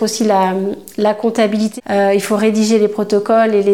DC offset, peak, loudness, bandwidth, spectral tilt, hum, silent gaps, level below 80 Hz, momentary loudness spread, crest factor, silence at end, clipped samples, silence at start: 0.3%; -2 dBFS; -15 LUFS; 16.5 kHz; -5 dB/octave; none; none; -62 dBFS; 5 LU; 12 dB; 0 s; under 0.1%; 0 s